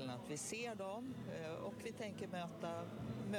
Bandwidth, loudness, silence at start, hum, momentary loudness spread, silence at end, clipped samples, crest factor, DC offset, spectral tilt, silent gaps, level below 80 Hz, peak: 18 kHz; -47 LUFS; 0 s; none; 3 LU; 0 s; under 0.1%; 16 dB; under 0.1%; -5 dB/octave; none; -74 dBFS; -30 dBFS